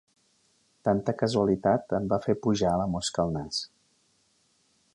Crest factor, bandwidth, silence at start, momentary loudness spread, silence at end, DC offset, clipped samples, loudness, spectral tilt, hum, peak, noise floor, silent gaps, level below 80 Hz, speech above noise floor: 18 dB; 11 kHz; 0.85 s; 7 LU; 1.3 s; under 0.1%; under 0.1%; -27 LUFS; -5.5 dB/octave; none; -10 dBFS; -68 dBFS; none; -54 dBFS; 42 dB